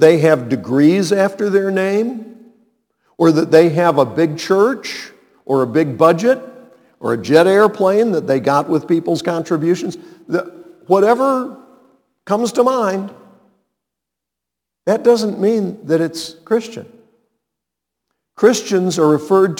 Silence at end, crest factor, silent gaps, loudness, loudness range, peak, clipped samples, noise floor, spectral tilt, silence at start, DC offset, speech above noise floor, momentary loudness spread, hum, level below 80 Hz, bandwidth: 0 s; 16 dB; none; -15 LUFS; 5 LU; 0 dBFS; under 0.1%; -82 dBFS; -6 dB/octave; 0 s; under 0.1%; 68 dB; 12 LU; none; -66 dBFS; 18 kHz